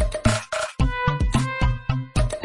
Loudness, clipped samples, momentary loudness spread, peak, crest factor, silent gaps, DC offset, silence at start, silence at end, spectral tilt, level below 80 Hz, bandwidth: -24 LUFS; under 0.1%; 4 LU; -4 dBFS; 18 dB; none; under 0.1%; 0 s; 0 s; -5.5 dB/octave; -26 dBFS; 11.5 kHz